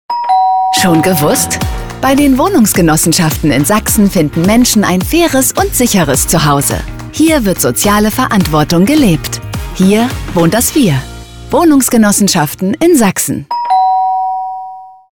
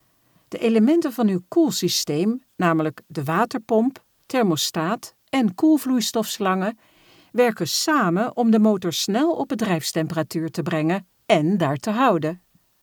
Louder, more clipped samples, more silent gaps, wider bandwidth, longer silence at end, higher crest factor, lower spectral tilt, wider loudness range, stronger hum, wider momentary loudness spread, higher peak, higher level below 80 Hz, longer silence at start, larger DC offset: first, -10 LUFS vs -21 LUFS; neither; neither; about the same, 20 kHz vs over 20 kHz; second, 0.2 s vs 0.45 s; second, 10 dB vs 18 dB; about the same, -4.5 dB/octave vs -5 dB/octave; about the same, 2 LU vs 2 LU; neither; about the same, 8 LU vs 8 LU; first, 0 dBFS vs -4 dBFS; first, -28 dBFS vs -70 dBFS; second, 0.1 s vs 0.5 s; neither